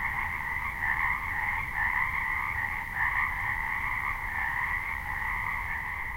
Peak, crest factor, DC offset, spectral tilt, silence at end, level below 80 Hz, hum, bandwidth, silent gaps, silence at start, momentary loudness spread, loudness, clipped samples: -14 dBFS; 16 dB; under 0.1%; -4 dB/octave; 0 s; -44 dBFS; none; 16 kHz; none; 0 s; 4 LU; -29 LUFS; under 0.1%